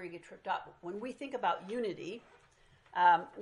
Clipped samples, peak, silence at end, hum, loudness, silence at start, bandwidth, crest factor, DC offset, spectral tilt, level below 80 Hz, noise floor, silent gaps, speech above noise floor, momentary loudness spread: under 0.1%; -14 dBFS; 0 s; none; -34 LUFS; 0 s; 10.5 kHz; 20 dB; under 0.1%; -5 dB/octave; -76 dBFS; -62 dBFS; none; 28 dB; 18 LU